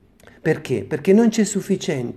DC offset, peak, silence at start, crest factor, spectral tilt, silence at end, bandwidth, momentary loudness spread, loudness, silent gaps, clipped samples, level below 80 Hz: under 0.1%; -4 dBFS; 0.45 s; 16 dB; -5.5 dB/octave; 0 s; 13.5 kHz; 8 LU; -20 LUFS; none; under 0.1%; -58 dBFS